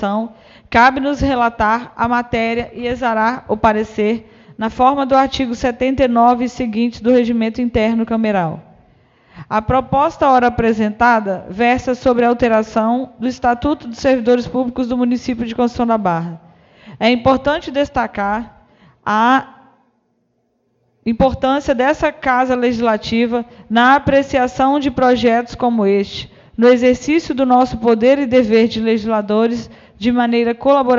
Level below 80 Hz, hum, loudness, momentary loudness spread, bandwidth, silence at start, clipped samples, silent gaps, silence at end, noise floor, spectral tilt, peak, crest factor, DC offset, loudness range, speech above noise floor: -40 dBFS; none; -15 LUFS; 8 LU; 7.4 kHz; 0 s; under 0.1%; none; 0 s; -64 dBFS; -6 dB/octave; 0 dBFS; 16 dB; under 0.1%; 4 LU; 49 dB